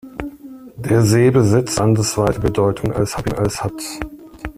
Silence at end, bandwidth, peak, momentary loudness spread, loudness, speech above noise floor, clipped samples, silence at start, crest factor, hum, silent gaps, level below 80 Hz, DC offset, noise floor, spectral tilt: 0.05 s; 15.5 kHz; -2 dBFS; 19 LU; -17 LUFS; 21 dB; under 0.1%; 0.05 s; 16 dB; none; none; -38 dBFS; under 0.1%; -37 dBFS; -6 dB/octave